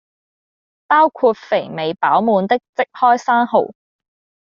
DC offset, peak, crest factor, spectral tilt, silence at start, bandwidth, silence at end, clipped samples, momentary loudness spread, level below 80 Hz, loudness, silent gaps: under 0.1%; -2 dBFS; 14 dB; -3 dB/octave; 0.9 s; 7.2 kHz; 0.75 s; under 0.1%; 7 LU; -66 dBFS; -16 LUFS; 2.69-2.73 s